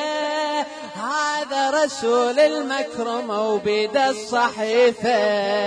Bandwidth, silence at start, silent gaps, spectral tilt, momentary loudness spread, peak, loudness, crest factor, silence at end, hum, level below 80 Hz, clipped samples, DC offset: 10.5 kHz; 0 s; none; -3 dB/octave; 7 LU; -6 dBFS; -21 LUFS; 14 dB; 0 s; none; -66 dBFS; under 0.1%; under 0.1%